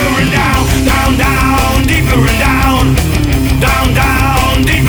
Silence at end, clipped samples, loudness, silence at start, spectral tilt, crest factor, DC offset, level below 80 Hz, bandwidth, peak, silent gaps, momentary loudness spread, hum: 0 s; under 0.1%; -10 LUFS; 0 s; -5 dB/octave; 10 dB; under 0.1%; -16 dBFS; over 20 kHz; 0 dBFS; none; 1 LU; none